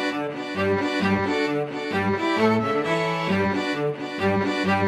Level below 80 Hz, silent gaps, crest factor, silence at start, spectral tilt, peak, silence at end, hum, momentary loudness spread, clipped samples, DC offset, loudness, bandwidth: -60 dBFS; none; 14 dB; 0 s; -6 dB/octave; -8 dBFS; 0 s; none; 6 LU; under 0.1%; under 0.1%; -23 LUFS; 13 kHz